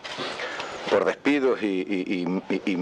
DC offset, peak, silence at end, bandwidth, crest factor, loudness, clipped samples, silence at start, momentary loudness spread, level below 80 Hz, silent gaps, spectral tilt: under 0.1%; -10 dBFS; 0 s; 10 kHz; 16 dB; -26 LUFS; under 0.1%; 0 s; 9 LU; -66 dBFS; none; -5.5 dB/octave